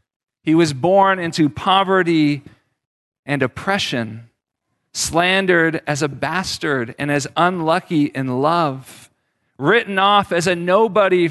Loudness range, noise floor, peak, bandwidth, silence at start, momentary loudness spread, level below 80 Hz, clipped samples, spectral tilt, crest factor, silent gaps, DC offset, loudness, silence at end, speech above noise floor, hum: 3 LU; -74 dBFS; -2 dBFS; 12.5 kHz; 0.45 s; 8 LU; -52 dBFS; under 0.1%; -4.5 dB/octave; 16 dB; 2.86-3.12 s, 3.19-3.23 s; under 0.1%; -17 LUFS; 0 s; 57 dB; none